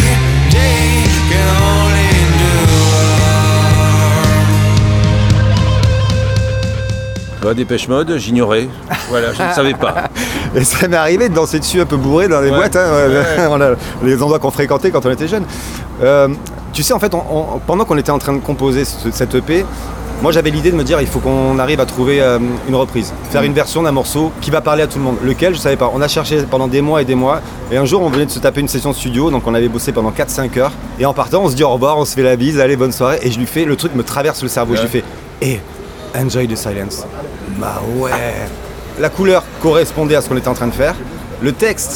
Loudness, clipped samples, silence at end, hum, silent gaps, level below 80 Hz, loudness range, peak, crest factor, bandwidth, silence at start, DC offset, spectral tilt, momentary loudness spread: -13 LUFS; under 0.1%; 0 s; none; none; -24 dBFS; 6 LU; 0 dBFS; 12 dB; 19 kHz; 0 s; under 0.1%; -5.5 dB/octave; 9 LU